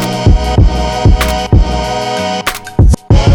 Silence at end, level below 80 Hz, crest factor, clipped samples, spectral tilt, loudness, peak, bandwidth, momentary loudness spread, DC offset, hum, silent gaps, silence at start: 0 s; -12 dBFS; 8 dB; under 0.1%; -6 dB/octave; -12 LUFS; 0 dBFS; 19.5 kHz; 5 LU; under 0.1%; none; none; 0 s